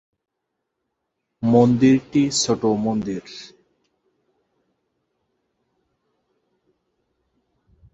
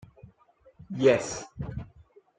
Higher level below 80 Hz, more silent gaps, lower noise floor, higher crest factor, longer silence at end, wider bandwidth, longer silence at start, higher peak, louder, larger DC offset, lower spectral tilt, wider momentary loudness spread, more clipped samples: about the same, -58 dBFS vs -54 dBFS; neither; first, -79 dBFS vs -61 dBFS; about the same, 22 dB vs 22 dB; first, 4.45 s vs 0.5 s; second, 8.2 kHz vs 9.4 kHz; first, 1.4 s vs 0.8 s; first, -2 dBFS vs -8 dBFS; first, -19 LUFS vs -27 LUFS; neither; about the same, -5.5 dB/octave vs -5 dB/octave; second, 16 LU vs 19 LU; neither